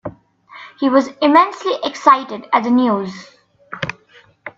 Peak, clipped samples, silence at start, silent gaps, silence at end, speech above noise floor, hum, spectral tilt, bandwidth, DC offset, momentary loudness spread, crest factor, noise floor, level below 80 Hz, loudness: 0 dBFS; under 0.1%; 0.05 s; none; 0.1 s; 35 dB; none; -5.5 dB/octave; 7.8 kHz; under 0.1%; 22 LU; 18 dB; -50 dBFS; -58 dBFS; -16 LUFS